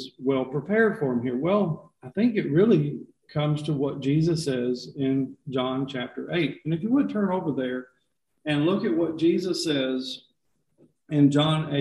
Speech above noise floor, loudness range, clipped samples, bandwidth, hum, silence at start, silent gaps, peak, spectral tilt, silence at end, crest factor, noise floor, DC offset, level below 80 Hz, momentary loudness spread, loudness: 50 dB; 3 LU; under 0.1%; 12 kHz; none; 0 s; none; -8 dBFS; -6.5 dB/octave; 0 s; 18 dB; -75 dBFS; under 0.1%; -62 dBFS; 10 LU; -25 LUFS